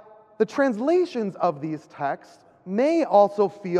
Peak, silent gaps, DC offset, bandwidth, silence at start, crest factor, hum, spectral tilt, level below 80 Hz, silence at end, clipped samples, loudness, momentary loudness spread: -6 dBFS; none; under 0.1%; 10 kHz; 0.4 s; 18 dB; none; -7 dB/octave; -78 dBFS; 0 s; under 0.1%; -23 LUFS; 11 LU